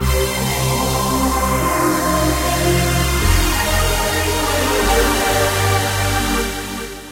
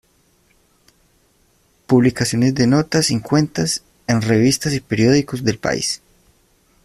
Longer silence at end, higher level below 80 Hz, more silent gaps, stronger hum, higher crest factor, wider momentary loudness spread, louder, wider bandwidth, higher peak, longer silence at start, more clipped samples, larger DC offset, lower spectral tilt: second, 0 s vs 0.9 s; first, -24 dBFS vs -48 dBFS; neither; neither; about the same, 14 dB vs 16 dB; second, 3 LU vs 6 LU; about the same, -17 LUFS vs -17 LUFS; about the same, 16 kHz vs 15 kHz; about the same, -2 dBFS vs -2 dBFS; second, 0 s vs 1.9 s; neither; neither; about the same, -4 dB/octave vs -5 dB/octave